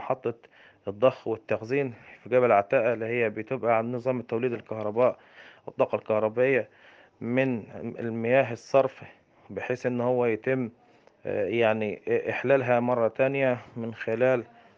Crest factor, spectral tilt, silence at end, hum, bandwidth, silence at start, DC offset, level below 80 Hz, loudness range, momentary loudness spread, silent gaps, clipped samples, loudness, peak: 20 dB; -7.5 dB/octave; 0.35 s; none; 7 kHz; 0 s; under 0.1%; -74 dBFS; 3 LU; 13 LU; none; under 0.1%; -27 LUFS; -8 dBFS